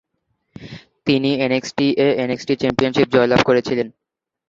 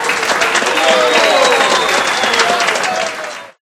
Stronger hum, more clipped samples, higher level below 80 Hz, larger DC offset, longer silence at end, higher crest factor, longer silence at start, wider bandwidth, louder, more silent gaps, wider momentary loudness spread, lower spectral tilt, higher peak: neither; neither; about the same, -50 dBFS vs -54 dBFS; neither; first, 0.6 s vs 0.15 s; about the same, 18 dB vs 14 dB; first, 0.6 s vs 0 s; second, 7.6 kHz vs 16.5 kHz; second, -18 LUFS vs -12 LUFS; neither; first, 13 LU vs 8 LU; first, -6 dB/octave vs -0.5 dB/octave; about the same, -2 dBFS vs 0 dBFS